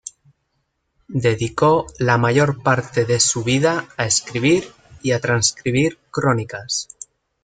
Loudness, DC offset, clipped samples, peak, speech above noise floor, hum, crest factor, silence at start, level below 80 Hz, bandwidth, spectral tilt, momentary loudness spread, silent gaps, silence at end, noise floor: -19 LUFS; under 0.1%; under 0.1%; -2 dBFS; 52 dB; none; 18 dB; 0.05 s; -52 dBFS; 9.6 kHz; -4 dB/octave; 10 LU; none; 0.6 s; -71 dBFS